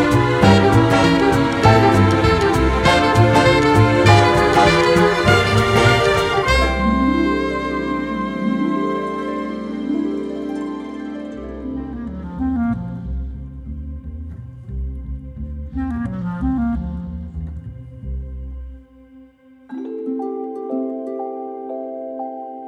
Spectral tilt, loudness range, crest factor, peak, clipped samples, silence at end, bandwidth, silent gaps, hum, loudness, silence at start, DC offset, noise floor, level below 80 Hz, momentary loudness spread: -6 dB/octave; 15 LU; 18 dB; 0 dBFS; under 0.1%; 0 s; 14.5 kHz; none; none; -17 LUFS; 0 s; under 0.1%; -47 dBFS; -32 dBFS; 18 LU